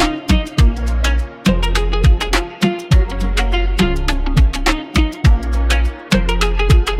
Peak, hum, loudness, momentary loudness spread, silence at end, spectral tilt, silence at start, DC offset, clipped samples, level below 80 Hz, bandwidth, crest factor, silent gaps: -2 dBFS; none; -17 LUFS; 4 LU; 0 s; -5.5 dB/octave; 0 s; under 0.1%; under 0.1%; -16 dBFS; 14 kHz; 12 dB; none